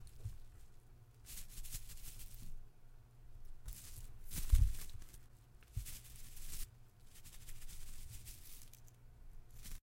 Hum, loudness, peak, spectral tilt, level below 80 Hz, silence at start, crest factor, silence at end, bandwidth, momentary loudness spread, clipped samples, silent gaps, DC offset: none; -48 LUFS; -18 dBFS; -3.5 dB/octave; -44 dBFS; 0 s; 26 dB; 0.05 s; 16.5 kHz; 19 LU; under 0.1%; none; under 0.1%